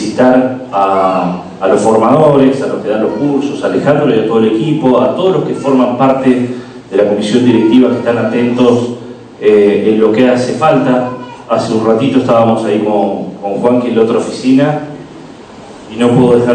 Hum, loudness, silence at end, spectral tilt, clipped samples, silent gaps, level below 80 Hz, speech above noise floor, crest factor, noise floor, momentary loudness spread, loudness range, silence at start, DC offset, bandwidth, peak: none; -11 LUFS; 0 s; -7 dB/octave; 1%; none; -52 dBFS; 22 dB; 10 dB; -31 dBFS; 8 LU; 2 LU; 0 s; under 0.1%; 9.2 kHz; 0 dBFS